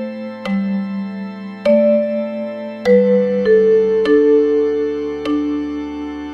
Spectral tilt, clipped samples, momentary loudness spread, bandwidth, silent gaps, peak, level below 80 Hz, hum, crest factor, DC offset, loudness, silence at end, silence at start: -8 dB/octave; under 0.1%; 14 LU; 6.2 kHz; none; -2 dBFS; -50 dBFS; none; 14 dB; under 0.1%; -16 LUFS; 0 s; 0 s